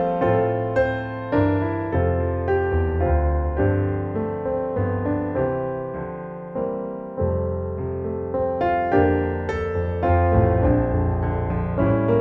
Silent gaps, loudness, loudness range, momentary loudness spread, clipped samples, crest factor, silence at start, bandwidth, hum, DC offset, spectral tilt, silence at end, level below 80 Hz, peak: none; -23 LUFS; 5 LU; 9 LU; under 0.1%; 16 dB; 0 s; 4.6 kHz; none; under 0.1%; -10.5 dB/octave; 0 s; -32 dBFS; -6 dBFS